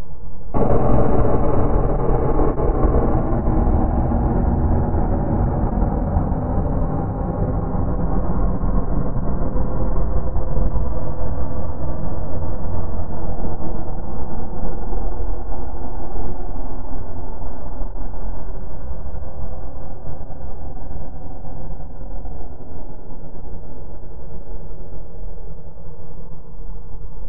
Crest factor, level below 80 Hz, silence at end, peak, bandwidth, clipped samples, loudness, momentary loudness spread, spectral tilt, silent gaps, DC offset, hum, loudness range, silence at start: 16 dB; -24 dBFS; 0 s; -2 dBFS; 2.6 kHz; under 0.1%; -24 LUFS; 18 LU; -12.5 dB/octave; none; 20%; none; 17 LU; 0 s